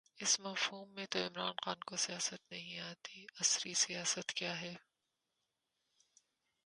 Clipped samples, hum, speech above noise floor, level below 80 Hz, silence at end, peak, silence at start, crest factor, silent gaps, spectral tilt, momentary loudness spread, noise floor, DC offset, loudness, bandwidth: under 0.1%; none; 47 dB; -88 dBFS; 1.85 s; -18 dBFS; 0.15 s; 24 dB; none; -0.5 dB/octave; 14 LU; -87 dBFS; under 0.1%; -37 LUFS; 11.5 kHz